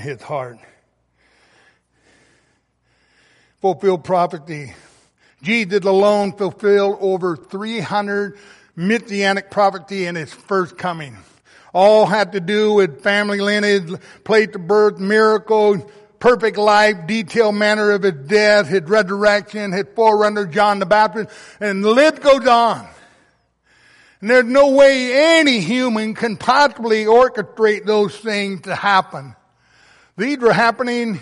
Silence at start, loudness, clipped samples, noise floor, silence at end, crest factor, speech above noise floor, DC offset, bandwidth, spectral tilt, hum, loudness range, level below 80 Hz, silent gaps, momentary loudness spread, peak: 0 s; -16 LUFS; under 0.1%; -63 dBFS; 0 s; 14 dB; 47 dB; under 0.1%; 11.5 kHz; -5 dB/octave; none; 6 LU; -58 dBFS; none; 13 LU; -2 dBFS